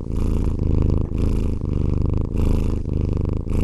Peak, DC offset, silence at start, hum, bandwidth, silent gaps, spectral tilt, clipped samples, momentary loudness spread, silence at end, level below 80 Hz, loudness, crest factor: -6 dBFS; under 0.1%; 0 s; none; 11.5 kHz; none; -9.5 dB/octave; under 0.1%; 3 LU; 0 s; -22 dBFS; -23 LUFS; 14 dB